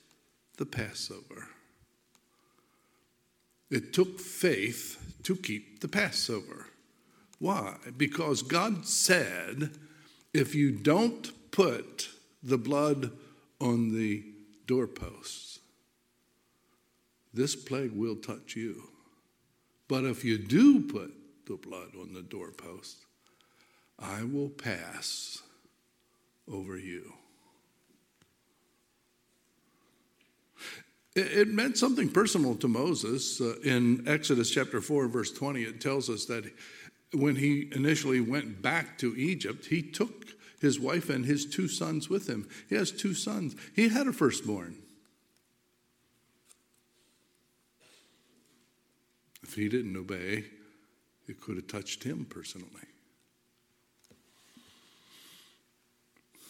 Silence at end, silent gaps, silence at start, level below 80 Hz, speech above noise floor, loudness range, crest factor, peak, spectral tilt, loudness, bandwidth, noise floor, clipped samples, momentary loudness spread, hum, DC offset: 0 s; none; 0.6 s; -68 dBFS; 42 dB; 14 LU; 26 dB; -8 dBFS; -4.5 dB/octave; -31 LUFS; 17 kHz; -73 dBFS; under 0.1%; 19 LU; none; under 0.1%